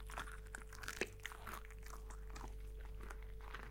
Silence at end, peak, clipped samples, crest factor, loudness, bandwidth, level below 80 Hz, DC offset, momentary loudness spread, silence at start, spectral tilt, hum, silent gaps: 0 s; -22 dBFS; under 0.1%; 28 dB; -51 LUFS; 17 kHz; -52 dBFS; under 0.1%; 8 LU; 0 s; -3.5 dB/octave; none; none